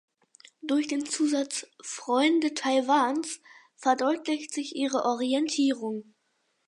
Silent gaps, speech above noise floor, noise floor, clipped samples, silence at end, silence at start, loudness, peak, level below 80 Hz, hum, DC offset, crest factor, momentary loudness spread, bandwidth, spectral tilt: none; 47 dB; -74 dBFS; under 0.1%; 0.65 s; 0.65 s; -27 LUFS; -10 dBFS; -82 dBFS; none; under 0.1%; 18 dB; 12 LU; 11.5 kHz; -2 dB/octave